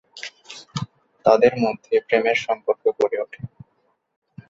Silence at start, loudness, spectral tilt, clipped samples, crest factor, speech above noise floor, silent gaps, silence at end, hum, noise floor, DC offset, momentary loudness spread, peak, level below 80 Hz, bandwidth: 0.15 s; -21 LUFS; -5.5 dB/octave; under 0.1%; 22 dB; 49 dB; none; 1 s; none; -68 dBFS; under 0.1%; 20 LU; -2 dBFS; -60 dBFS; 7.8 kHz